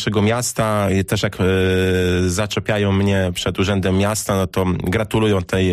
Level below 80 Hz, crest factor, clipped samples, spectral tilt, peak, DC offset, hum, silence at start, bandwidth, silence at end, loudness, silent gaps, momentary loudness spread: -40 dBFS; 10 dB; under 0.1%; -5.5 dB/octave; -8 dBFS; under 0.1%; none; 0 s; 15.5 kHz; 0 s; -18 LUFS; none; 3 LU